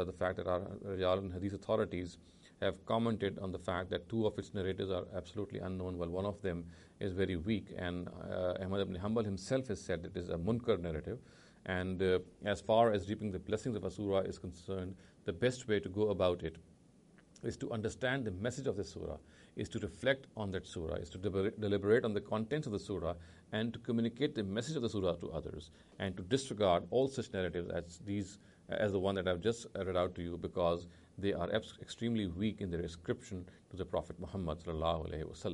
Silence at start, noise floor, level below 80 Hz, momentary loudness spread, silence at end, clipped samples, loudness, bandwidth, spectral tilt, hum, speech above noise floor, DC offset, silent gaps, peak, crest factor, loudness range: 0 s; -64 dBFS; -58 dBFS; 10 LU; 0 s; under 0.1%; -38 LUFS; 11.5 kHz; -6 dB/octave; none; 27 dB; under 0.1%; none; -16 dBFS; 22 dB; 4 LU